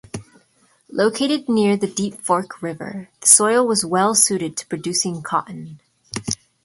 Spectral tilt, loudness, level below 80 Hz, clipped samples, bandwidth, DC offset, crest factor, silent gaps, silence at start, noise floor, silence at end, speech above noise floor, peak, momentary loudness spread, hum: -3 dB/octave; -18 LUFS; -58 dBFS; under 0.1%; 16 kHz; under 0.1%; 20 dB; none; 0.15 s; -59 dBFS; 0.3 s; 40 dB; 0 dBFS; 20 LU; none